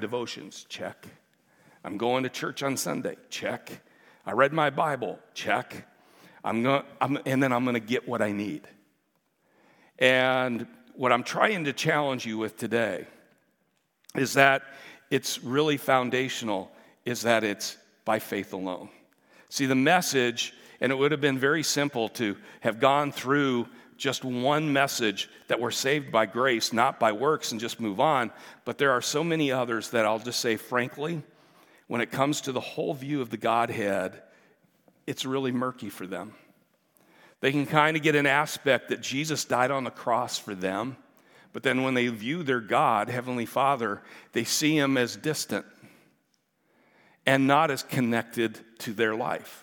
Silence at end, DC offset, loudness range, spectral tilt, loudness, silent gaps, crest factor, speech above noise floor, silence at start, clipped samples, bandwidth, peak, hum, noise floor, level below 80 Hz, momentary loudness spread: 0 s; under 0.1%; 5 LU; -4 dB/octave; -27 LUFS; none; 26 dB; 46 dB; 0 s; under 0.1%; 18 kHz; -2 dBFS; none; -73 dBFS; -82 dBFS; 14 LU